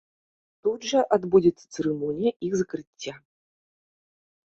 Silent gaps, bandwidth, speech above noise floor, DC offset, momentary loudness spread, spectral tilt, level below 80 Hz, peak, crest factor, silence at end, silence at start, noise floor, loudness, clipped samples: 2.36-2.40 s, 2.87-2.93 s; 8 kHz; over 65 dB; under 0.1%; 15 LU; -5.5 dB/octave; -64 dBFS; -6 dBFS; 20 dB; 1.35 s; 0.65 s; under -90 dBFS; -25 LUFS; under 0.1%